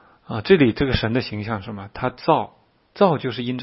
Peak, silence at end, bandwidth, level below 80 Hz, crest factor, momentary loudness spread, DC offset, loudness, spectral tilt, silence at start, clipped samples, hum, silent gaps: -2 dBFS; 0 s; 5.8 kHz; -42 dBFS; 20 dB; 14 LU; under 0.1%; -21 LUFS; -10.5 dB/octave; 0.3 s; under 0.1%; none; none